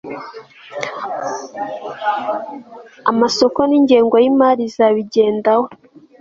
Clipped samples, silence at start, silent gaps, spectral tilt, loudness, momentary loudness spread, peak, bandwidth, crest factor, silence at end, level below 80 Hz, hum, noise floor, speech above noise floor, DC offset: under 0.1%; 0.05 s; none; -4.5 dB/octave; -16 LUFS; 17 LU; -2 dBFS; 7.6 kHz; 16 dB; 0.45 s; -60 dBFS; none; -36 dBFS; 21 dB; under 0.1%